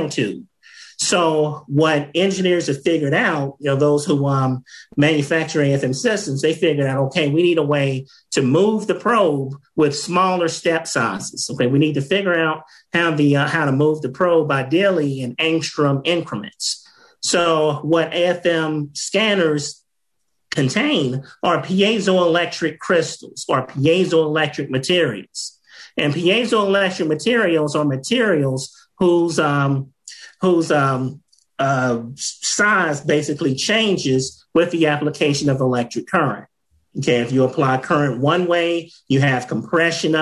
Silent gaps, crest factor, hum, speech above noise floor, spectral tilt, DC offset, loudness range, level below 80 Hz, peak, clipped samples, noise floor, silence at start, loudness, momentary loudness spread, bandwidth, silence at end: none; 14 dB; none; 59 dB; -5 dB/octave; under 0.1%; 2 LU; -60 dBFS; -4 dBFS; under 0.1%; -77 dBFS; 0 s; -18 LUFS; 8 LU; 12 kHz; 0 s